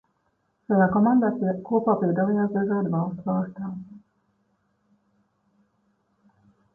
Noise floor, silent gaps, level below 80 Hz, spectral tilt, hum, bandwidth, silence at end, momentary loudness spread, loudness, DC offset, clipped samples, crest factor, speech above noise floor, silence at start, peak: -71 dBFS; none; -64 dBFS; -13 dB/octave; none; 1.8 kHz; 2.75 s; 11 LU; -24 LUFS; under 0.1%; under 0.1%; 18 dB; 49 dB; 0.7 s; -8 dBFS